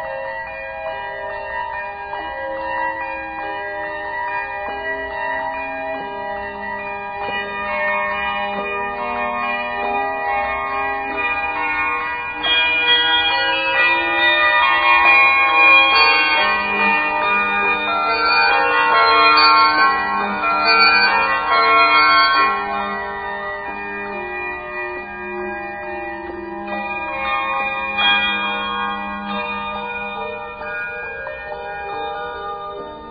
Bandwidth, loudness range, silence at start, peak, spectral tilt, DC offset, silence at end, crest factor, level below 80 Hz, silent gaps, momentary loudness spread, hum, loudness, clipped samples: 5 kHz; 13 LU; 0 s; 0 dBFS; -7.5 dB/octave; under 0.1%; 0 s; 18 dB; -48 dBFS; none; 16 LU; none; -17 LUFS; under 0.1%